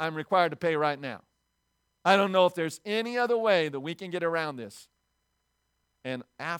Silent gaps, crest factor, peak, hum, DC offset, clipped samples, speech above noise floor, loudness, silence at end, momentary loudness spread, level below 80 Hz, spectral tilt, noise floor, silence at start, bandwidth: none; 22 dB; -8 dBFS; none; under 0.1%; under 0.1%; 50 dB; -27 LUFS; 0 s; 15 LU; -78 dBFS; -5 dB/octave; -77 dBFS; 0 s; 17 kHz